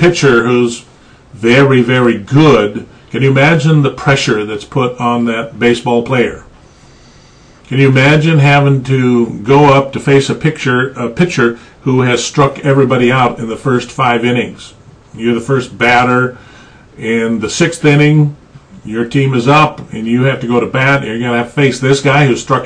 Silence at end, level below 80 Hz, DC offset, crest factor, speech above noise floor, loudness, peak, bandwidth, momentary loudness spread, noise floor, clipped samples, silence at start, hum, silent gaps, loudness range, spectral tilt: 0 s; -42 dBFS; under 0.1%; 12 dB; 30 dB; -11 LUFS; 0 dBFS; 10 kHz; 9 LU; -41 dBFS; under 0.1%; 0 s; none; none; 4 LU; -6 dB/octave